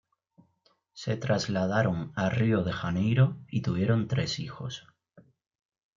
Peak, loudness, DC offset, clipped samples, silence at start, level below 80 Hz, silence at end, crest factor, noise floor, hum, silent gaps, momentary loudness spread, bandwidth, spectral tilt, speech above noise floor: -12 dBFS; -29 LUFS; under 0.1%; under 0.1%; 0.95 s; -60 dBFS; 0.75 s; 18 dB; -70 dBFS; none; none; 12 LU; 7.6 kHz; -6.5 dB/octave; 42 dB